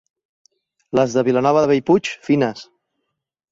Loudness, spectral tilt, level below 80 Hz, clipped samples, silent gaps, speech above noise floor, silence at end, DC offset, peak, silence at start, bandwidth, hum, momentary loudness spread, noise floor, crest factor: -18 LUFS; -6 dB/octave; -60 dBFS; under 0.1%; none; 59 dB; 0.9 s; under 0.1%; -4 dBFS; 0.95 s; 7.8 kHz; none; 7 LU; -76 dBFS; 16 dB